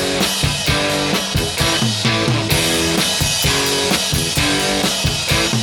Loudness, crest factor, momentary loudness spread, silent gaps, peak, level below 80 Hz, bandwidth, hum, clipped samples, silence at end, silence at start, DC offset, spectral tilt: -16 LUFS; 14 dB; 2 LU; none; -2 dBFS; -32 dBFS; 19 kHz; none; under 0.1%; 0 s; 0 s; under 0.1%; -3 dB/octave